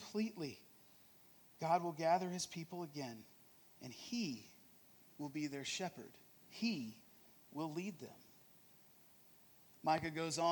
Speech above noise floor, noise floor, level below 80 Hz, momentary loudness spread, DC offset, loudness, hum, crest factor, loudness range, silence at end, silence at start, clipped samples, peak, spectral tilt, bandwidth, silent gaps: 25 dB; -66 dBFS; -82 dBFS; 25 LU; under 0.1%; -42 LUFS; none; 22 dB; 6 LU; 0 s; 0 s; under 0.1%; -22 dBFS; -4.5 dB/octave; 19 kHz; none